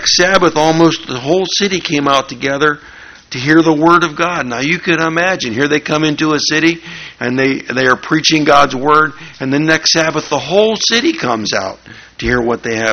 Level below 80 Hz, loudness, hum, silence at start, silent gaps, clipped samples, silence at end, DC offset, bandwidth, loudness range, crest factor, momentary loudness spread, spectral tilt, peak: -42 dBFS; -12 LUFS; none; 0 s; none; 0.2%; 0 s; under 0.1%; 8 kHz; 2 LU; 14 dB; 9 LU; -3.5 dB/octave; 0 dBFS